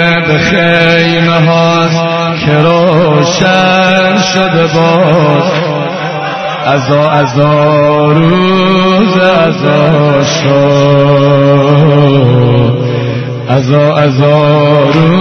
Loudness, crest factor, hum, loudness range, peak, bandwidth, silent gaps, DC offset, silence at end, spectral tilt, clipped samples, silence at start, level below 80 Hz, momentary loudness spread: -7 LUFS; 8 dB; none; 2 LU; 0 dBFS; 6.6 kHz; none; under 0.1%; 0 s; -6.5 dB/octave; 0.5%; 0 s; -40 dBFS; 5 LU